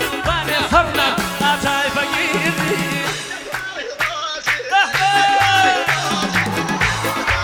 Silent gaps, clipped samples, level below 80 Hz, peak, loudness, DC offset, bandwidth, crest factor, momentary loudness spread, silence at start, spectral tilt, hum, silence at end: none; under 0.1%; -38 dBFS; -2 dBFS; -17 LUFS; under 0.1%; over 20 kHz; 16 dB; 8 LU; 0 s; -3 dB/octave; none; 0 s